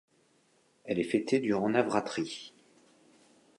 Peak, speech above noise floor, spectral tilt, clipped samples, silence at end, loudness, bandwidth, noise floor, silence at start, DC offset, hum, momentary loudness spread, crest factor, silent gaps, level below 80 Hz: -12 dBFS; 39 dB; -5.5 dB/octave; under 0.1%; 1.1 s; -30 LUFS; 11.5 kHz; -68 dBFS; 0.85 s; under 0.1%; none; 16 LU; 22 dB; none; -72 dBFS